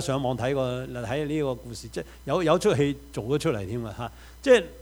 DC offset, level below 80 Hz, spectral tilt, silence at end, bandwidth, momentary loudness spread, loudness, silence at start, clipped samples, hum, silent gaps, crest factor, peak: under 0.1%; -48 dBFS; -5.5 dB/octave; 0 s; over 20 kHz; 15 LU; -26 LUFS; 0 s; under 0.1%; none; none; 20 dB; -6 dBFS